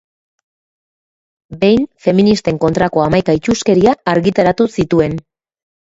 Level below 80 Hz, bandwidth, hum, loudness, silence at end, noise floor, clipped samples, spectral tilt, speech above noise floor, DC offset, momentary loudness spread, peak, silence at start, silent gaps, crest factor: -42 dBFS; 8 kHz; none; -13 LUFS; 0.75 s; under -90 dBFS; under 0.1%; -6.5 dB/octave; over 77 dB; under 0.1%; 4 LU; 0 dBFS; 1.5 s; none; 14 dB